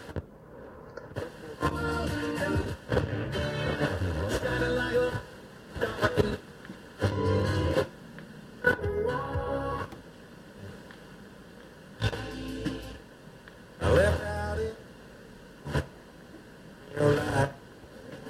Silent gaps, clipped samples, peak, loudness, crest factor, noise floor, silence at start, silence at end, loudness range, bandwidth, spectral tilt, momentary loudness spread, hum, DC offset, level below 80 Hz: none; under 0.1%; -8 dBFS; -30 LUFS; 22 dB; -49 dBFS; 0 s; 0 s; 7 LU; 15 kHz; -6 dB/octave; 22 LU; none; under 0.1%; -46 dBFS